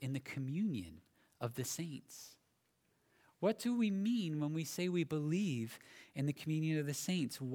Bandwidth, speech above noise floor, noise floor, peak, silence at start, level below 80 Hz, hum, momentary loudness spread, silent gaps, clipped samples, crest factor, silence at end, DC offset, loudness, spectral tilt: 19.5 kHz; 40 dB; -79 dBFS; -20 dBFS; 0 s; -76 dBFS; none; 14 LU; none; under 0.1%; 18 dB; 0 s; under 0.1%; -39 LUFS; -5.5 dB/octave